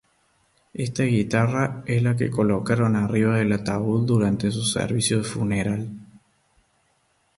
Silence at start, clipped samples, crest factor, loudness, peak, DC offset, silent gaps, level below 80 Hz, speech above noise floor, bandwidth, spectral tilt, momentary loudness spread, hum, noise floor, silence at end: 0.75 s; under 0.1%; 16 dB; -23 LUFS; -8 dBFS; under 0.1%; none; -50 dBFS; 45 dB; 11.5 kHz; -6 dB/octave; 7 LU; none; -66 dBFS; 1.35 s